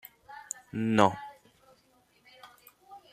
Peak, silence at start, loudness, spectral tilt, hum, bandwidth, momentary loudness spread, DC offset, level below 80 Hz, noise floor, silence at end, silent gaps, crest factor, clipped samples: -6 dBFS; 0.3 s; -28 LUFS; -5 dB/octave; none; 15 kHz; 27 LU; under 0.1%; -70 dBFS; -66 dBFS; 0.15 s; none; 28 dB; under 0.1%